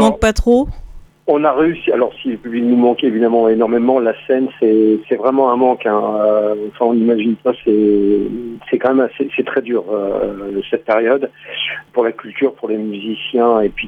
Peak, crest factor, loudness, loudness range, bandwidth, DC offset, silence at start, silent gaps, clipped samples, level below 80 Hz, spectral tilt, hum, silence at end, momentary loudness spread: -2 dBFS; 14 dB; -15 LUFS; 4 LU; 11.5 kHz; under 0.1%; 0 s; none; under 0.1%; -36 dBFS; -6 dB/octave; none; 0 s; 8 LU